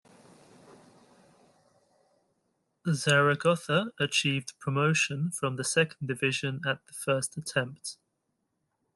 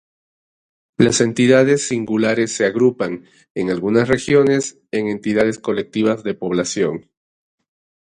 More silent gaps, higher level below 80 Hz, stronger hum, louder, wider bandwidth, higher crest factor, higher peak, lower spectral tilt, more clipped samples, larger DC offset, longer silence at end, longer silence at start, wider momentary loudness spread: second, none vs 3.50-3.55 s; second, -70 dBFS vs -54 dBFS; neither; second, -28 LUFS vs -17 LUFS; first, 12.5 kHz vs 11 kHz; about the same, 22 dB vs 18 dB; second, -10 dBFS vs 0 dBFS; about the same, -4 dB/octave vs -5 dB/octave; neither; neither; second, 1 s vs 1.15 s; first, 2.85 s vs 1 s; about the same, 9 LU vs 11 LU